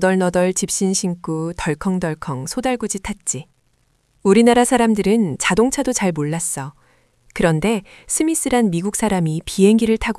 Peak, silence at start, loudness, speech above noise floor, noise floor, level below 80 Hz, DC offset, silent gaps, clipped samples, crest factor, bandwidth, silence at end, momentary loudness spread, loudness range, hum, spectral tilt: 0 dBFS; 0 s; -18 LUFS; 44 dB; -62 dBFS; -42 dBFS; under 0.1%; none; under 0.1%; 18 dB; 12 kHz; 0.05 s; 10 LU; 5 LU; none; -4.5 dB/octave